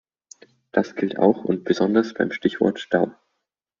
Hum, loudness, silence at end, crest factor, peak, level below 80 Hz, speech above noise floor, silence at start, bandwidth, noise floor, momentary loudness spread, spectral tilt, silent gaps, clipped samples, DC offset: none; -22 LUFS; 0.7 s; 20 dB; -4 dBFS; -62 dBFS; 58 dB; 0.75 s; 7.2 kHz; -79 dBFS; 6 LU; -5 dB/octave; none; under 0.1%; under 0.1%